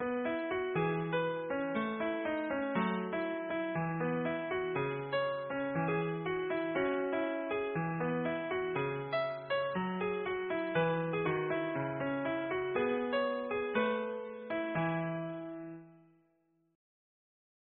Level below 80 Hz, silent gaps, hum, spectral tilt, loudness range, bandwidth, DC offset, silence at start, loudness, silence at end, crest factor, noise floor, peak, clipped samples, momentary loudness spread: -70 dBFS; none; none; -5 dB/octave; 3 LU; 4.3 kHz; under 0.1%; 0 s; -35 LUFS; 1.75 s; 16 dB; -75 dBFS; -20 dBFS; under 0.1%; 3 LU